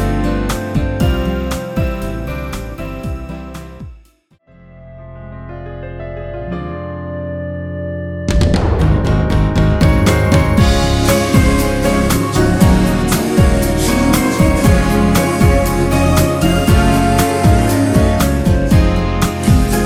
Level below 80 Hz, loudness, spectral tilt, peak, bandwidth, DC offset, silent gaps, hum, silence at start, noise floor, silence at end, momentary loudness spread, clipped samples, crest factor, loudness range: -20 dBFS; -14 LUFS; -6 dB/octave; 0 dBFS; 16.5 kHz; under 0.1%; none; none; 0 s; -50 dBFS; 0 s; 14 LU; under 0.1%; 14 dB; 16 LU